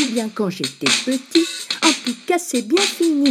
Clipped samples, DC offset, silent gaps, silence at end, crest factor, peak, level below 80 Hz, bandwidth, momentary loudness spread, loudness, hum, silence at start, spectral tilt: under 0.1%; under 0.1%; none; 0 s; 18 dB; -2 dBFS; -70 dBFS; 15.5 kHz; 6 LU; -19 LUFS; none; 0 s; -2.5 dB/octave